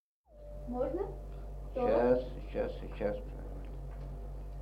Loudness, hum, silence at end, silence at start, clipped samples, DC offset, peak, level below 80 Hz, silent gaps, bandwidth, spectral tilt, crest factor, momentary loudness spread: -36 LUFS; none; 0 s; 0.3 s; under 0.1%; under 0.1%; -16 dBFS; -44 dBFS; none; 6.4 kHz; -8.5 dB/octave; 20 dB; 17 LU